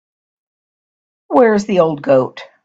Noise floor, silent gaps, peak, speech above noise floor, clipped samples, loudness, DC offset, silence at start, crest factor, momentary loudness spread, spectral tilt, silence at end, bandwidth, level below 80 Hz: under -90 dBFS; none; 0 dBFS; over 77 dB; under 0.1%; -14 LUFS; under 0.1%; 1.3 s; 16 dB; 5 LU; -6.5 dB/octave; 0.2 s; 8 kHz; -58 dBFS